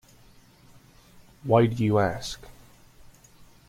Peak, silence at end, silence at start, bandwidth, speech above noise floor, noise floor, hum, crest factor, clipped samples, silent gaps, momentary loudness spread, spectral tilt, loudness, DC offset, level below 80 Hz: -8 dBFS; 0.25 s; 1.45 s; 15.5 kHz; 32 dB; -55 dBFS; none; 22 dB; under 0.1%; none; 18 LU; -7 dB/octave; -24 LUFS; under 0.1%; -54 dBFS